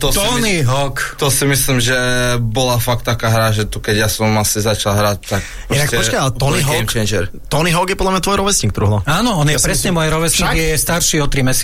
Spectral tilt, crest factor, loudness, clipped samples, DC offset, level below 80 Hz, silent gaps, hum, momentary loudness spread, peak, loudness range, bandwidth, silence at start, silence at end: -3.5 dB/octave; 12 dB; -15 LUFS; under 0.1%; under 0.1%; -26 dBFS; none; none; 4 LU; -2 dBFS; 2 LU; 16.5 kHz; 0 s; 0 s